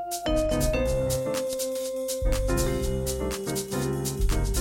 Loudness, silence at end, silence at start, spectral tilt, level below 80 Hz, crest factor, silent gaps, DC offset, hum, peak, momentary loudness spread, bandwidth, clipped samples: -28 LUFS; 0 s; 0 s; -5 dB/octave; -32 dBFS; 14 dB; none; under 0.1%; none; -12 dBFS; 4 LU; 17 kHz; under 0.1%